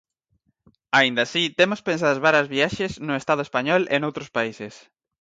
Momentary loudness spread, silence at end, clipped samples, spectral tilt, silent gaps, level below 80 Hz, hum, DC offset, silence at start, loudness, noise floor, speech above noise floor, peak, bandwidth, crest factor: 9 LU; 0.45 s; under 0.1%; -4.5 dB/octave; none; -60 dBFS; none; under 0.1%; 0.95 s; -21 LUFS; -70 dBFS; 48 dB; -4 dBFS; 9.2 kHz; 18 dB